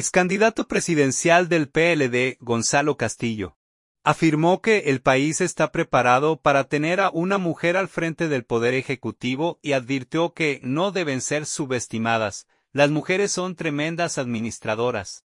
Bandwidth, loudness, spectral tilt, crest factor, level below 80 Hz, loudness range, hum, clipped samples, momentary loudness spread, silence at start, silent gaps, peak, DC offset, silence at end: 11.5 kHz; -22 LUFS; -4.5 dB/octave; 20 dB; -58 dBFS; 4 LU; none; under 0.1%; 8 LU; 0 s; 3.56-3.95 s; -2 dBFS; under 0.1%; 0.15 s